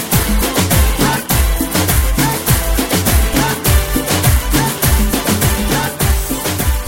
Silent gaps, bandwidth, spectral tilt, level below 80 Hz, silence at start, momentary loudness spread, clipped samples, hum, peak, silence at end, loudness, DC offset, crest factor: none; 17 kHz; -4 dB/octave; -18 dBFS; 0 s; 2 LU; under 0.1%; none; 0 dBFS; 0 s; -14 LUFS; under 0.1%; 14 dB